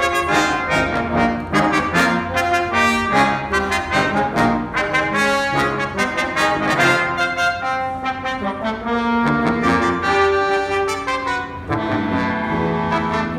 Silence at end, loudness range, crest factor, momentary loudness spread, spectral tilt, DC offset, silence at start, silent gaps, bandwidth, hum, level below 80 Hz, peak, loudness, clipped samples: 0 s; 2 LU; 16 dB; 6 LU; -4.5 dB/octave; under 0.1%; 0 s; none; 16 kHz; none; -40 dBFS; -4 dBFS; -18 LUFS; under 0.1%